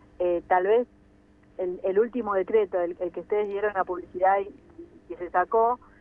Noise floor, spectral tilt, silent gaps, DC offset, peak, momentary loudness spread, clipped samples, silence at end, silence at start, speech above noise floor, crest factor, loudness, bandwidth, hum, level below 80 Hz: -57 dBFS; -8 dB/octave; none; under 0.1%; -10 dBFS; 11 LU; under 0.1%; 0.25 s; 0.2 s; 31 dB; 18 dB; -26 LUFS; 3.5 kHz; none; -60 dBFS